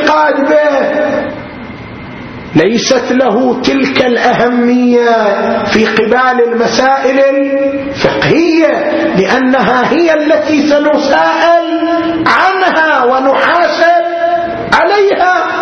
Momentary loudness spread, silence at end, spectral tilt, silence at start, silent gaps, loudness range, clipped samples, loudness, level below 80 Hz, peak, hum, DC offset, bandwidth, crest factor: 5 LU; 0 s; -5 dB/octave; 0 s; none; 3 LU; 0.2%; -9 LUFS; -44 dBFS; 0 dBFS; none; under 0.1%; 8.2 kHz; 10 dB